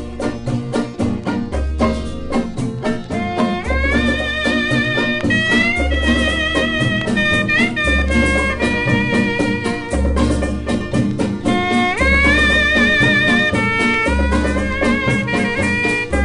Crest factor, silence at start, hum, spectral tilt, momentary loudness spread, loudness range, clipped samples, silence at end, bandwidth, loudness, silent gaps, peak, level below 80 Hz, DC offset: 14 dB; 0 s; none; -5.5 dB/octave; 9 LU; 6 LU; under 0.1%; 0 s; 10.5 kHz; -16 LUFS; none; -2 dBFS; -26 dBFS; under 0.1%